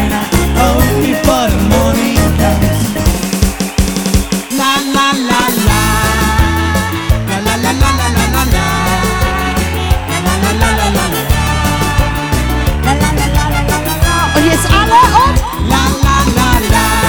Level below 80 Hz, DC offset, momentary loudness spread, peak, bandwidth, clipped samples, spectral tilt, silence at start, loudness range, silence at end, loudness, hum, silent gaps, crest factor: -18 dBFS; 1%; 4 LU; 0 dBFS; over 20 kHz; under 0.1%; -4.5 dB/octave; 0 s; 3 LU; 0 s; -12 LUFS; none; none; 12 dB